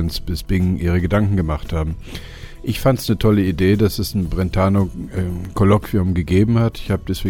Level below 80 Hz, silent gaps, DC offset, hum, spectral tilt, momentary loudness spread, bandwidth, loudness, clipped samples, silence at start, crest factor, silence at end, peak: -30 dBFS; none; under 0.1%; none; -7 dB/octave; 10 LU; 17 kHz; -19 LUFS; under 0.1%; 0 s; 16 dB; 0 s; -2 dBFS